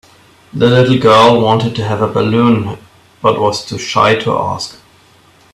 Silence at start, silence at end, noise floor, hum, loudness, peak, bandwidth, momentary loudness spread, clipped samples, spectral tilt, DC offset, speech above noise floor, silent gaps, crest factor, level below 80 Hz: 0.55 s; 0.8 s; -46 dBFS; none; -12 LUFS; 0 dBFS; 13 kHz; 14 LU; under 0.1%; -6 dB/octave; under 0.1%; 35 dB; none; 12 dB; -48 dBFS